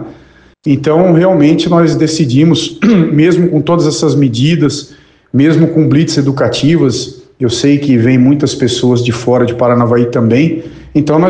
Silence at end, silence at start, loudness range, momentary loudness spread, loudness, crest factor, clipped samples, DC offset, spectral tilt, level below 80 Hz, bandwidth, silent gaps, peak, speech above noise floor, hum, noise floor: 0 s; 0 s; 2 LU; 6 LU; -10 LUFS; 10 dB; under 0.1%; 0.1%; -6.5 dB/octave; -44 dBFS; 9.6 kHz; none; 0 dBFS; 32 dB; none; -41 dBFS